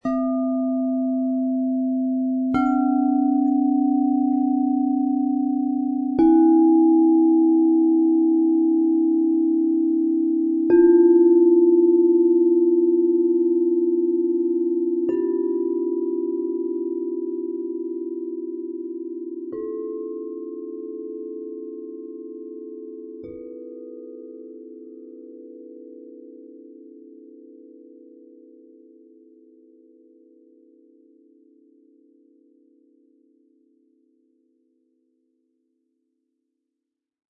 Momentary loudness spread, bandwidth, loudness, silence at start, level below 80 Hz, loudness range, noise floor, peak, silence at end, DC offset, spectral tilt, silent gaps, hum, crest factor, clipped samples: 22 LU; 2.3 kHz; -20 LUFS; 0.05 s; -64 dBFS; 21 LU; -84 dBFS; -6 dBFS; 10.45 s; under 0.1%; -10 dB/octave; none; none; 16 dB; under 0.1%